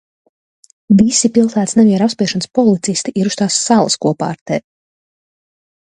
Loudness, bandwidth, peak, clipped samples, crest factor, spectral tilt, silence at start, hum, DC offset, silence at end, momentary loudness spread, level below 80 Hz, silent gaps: -14 LUFS; 10 kHz; 0 dBFS; under 0.1%; 16 dB; -4.5 dB/octave; 0.9 s; none; under 0.1%; 1.35 s; 8 LU; -54 dBFS; 4.41-4.46 s